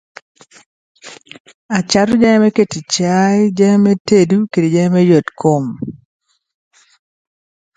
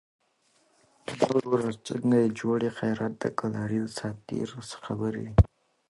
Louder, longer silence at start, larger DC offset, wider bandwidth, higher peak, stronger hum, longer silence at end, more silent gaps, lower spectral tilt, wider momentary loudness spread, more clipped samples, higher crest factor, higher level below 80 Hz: first, -13 LUFS vs -28 LUFS; about the same, 1.05 s vs 1.1 s; neither; second, 9.4 kHz vs 11.5 kHz; first, 0 dBFS vs -6 dBFS; neither; first, 1.8 s vs 0.45 s; first, 1.40-1.45 s, 1.54-1.69 s, 4.00-4.05 s vs none; about the same, -6 dB/octave vs -7 dB/octave; second, 9 LU vs 12 LU; neither; second, 14 dB vs 22 dB; second, -52 dBFS vs -38 dBFS